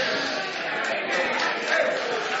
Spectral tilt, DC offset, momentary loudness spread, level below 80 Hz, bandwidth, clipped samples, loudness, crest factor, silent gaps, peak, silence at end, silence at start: -2 dB/octave; under 0.1%; 4 LU; -70 dBFS; 8 kHz; under 0.1%; -25 LUFS; 18 dB; none; -8 dBFS; 0 s; 0 s